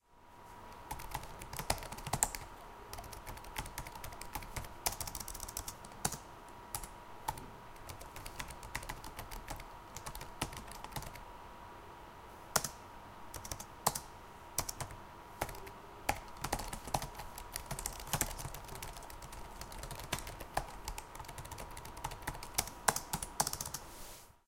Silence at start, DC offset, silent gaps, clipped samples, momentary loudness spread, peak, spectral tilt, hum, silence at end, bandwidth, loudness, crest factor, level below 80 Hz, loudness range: 0.1 s; under 0.1%; none; under 0.1%; 16 LU; -8 dBFS; -2.5 dB/octave; none; 0.1 s; 17 kHz; -42 LUFS; 36 dB; -52 dBFS; 6 LU